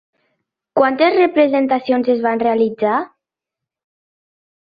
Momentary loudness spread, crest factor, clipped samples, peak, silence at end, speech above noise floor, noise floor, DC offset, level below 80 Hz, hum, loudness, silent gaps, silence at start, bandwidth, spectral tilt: 7 LU; 16 dB; under 0.1%; -2 dBFS; 1.6 s; 70 dB; -85 dBFS; under 0.1%; -64 dBFS; none; -16 LUFS; none; 0.75 s; 5 kHz; -8.5 dB/octave